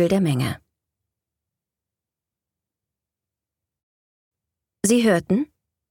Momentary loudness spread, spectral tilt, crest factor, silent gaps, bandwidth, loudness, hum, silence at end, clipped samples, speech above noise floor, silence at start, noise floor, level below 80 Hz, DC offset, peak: 13 LU; -5.5 dB/octave; 20 dB; 3.83-4.31 s; 18 kHz; -21 LUFS; none; 0.45 s; under 0.1%; 69 dB; 0 s; -88 dBFS; -60 dBFS; under 0.1%; -6 dBFS